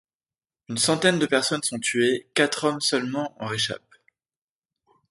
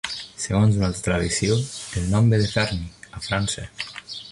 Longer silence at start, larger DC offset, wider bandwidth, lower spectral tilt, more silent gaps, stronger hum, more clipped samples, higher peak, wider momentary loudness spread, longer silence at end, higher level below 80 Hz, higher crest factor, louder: first, 0.7 s vs 0.05 s; neither; about the same, 12 kHz vs 11.5 kHz; second, -3 dB/octave vs -5 dB/octave; neither; neither; neither; first, -4 dBFS vs -8 dBFS; second, 9 LU vs 13 LU; first, 1.35 s vs 0 s; second, -68 dBFS vs -40 dBFS; first, 22 dB vs 16 dB; about the same, -23 LUFS vs -23 LUFS